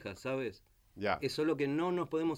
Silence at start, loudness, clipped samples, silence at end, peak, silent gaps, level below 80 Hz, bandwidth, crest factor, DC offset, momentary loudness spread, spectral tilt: 0 s; -35 LUFS; under 0.1%; 0 s; -16 dBFS; none; -68 dBFS; 16 kHz; 18 dB; under 0.1%; 6 LU; -6 dB/octave